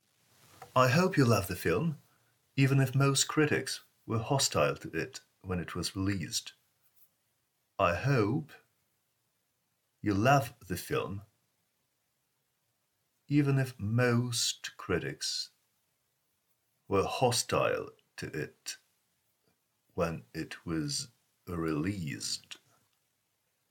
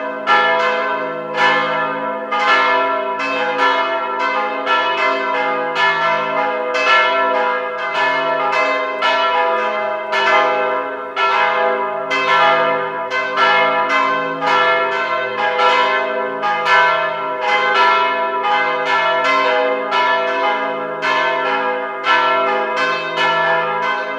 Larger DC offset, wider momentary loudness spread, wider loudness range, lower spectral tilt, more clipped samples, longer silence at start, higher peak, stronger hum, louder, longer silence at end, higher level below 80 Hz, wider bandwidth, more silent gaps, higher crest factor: neither; first, 15 LU vs 7 LU; first, 8 LU vs 2 LU; first, -4.5 dB/octave vs -3 dB/octave; neither; first, 0.6 s vs 0 s; second, -12 dBFS vs 0 dBFS; neither; second, -31 LUFS vs -16 LUFS; first, 1.15 s vs 0 s; first, -64 dBFS vs -80 dBFS; first, 19 kHz vs 10.5 kHz; neither; first, 22 dB vs 16 dB